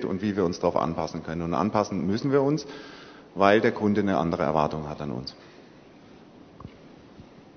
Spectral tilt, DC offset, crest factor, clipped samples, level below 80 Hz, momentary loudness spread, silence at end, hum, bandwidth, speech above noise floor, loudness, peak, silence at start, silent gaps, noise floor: -6.5 dB/octave; under 0.1%; 22 dB; under 0.1%; -54 dBFS; 21 LU; 0.15 s; none; 6.6 kHz; 25 dB; -25 LUFS; -4 dBFS; 0 s; none; -50 dBFS